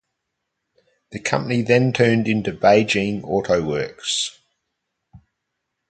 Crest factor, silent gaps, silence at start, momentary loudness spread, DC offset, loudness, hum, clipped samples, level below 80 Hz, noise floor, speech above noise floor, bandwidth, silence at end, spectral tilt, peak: 20 dB; none; 1.1 s; 9 LU; under 0.1%; -19 LUFS; none; under 0.1%; -54 dBFS; -78 dBFS; 59 dB; 9.4 kHz; 0.7 s; -5 dB/octave; -2 dBFS